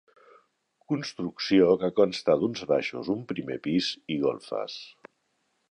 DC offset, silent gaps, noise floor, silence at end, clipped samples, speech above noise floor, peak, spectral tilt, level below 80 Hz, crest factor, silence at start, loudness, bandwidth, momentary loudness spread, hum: under 0.1%; none; -74 dBFS; 0.8 s; under 0.1%; 48 dB; -8 dBFS; -6 dB/octave; -64 dBFS; 20 dB; 0.9 s; -27 LUFS; 10.5 kHz; 12 LU; none